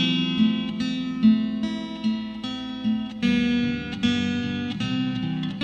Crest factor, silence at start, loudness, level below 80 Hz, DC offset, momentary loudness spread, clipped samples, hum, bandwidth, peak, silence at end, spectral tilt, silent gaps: 16 dB; 0 s; -25 LUFS; -52 dBFS; under 0.1%; 8 LU; under 0.1%; none; 8.4 kHz; -8 dBFS; 0 s; -6 dB/octave; none